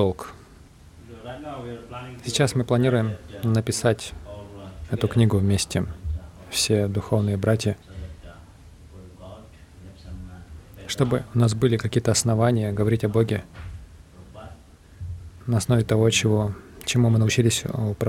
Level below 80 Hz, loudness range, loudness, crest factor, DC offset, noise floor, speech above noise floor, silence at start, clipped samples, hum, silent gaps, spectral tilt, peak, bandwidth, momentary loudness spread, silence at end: -44 dBFS; 6 LU; -23 LUFS; 18 dB; under 0.1%; -48 dBFS; 26 dB; 0 s; under 0.1%; none; none; -5.5 dB/octave; -6 dBFS; 15.5 kHz; 21 LU; 0 s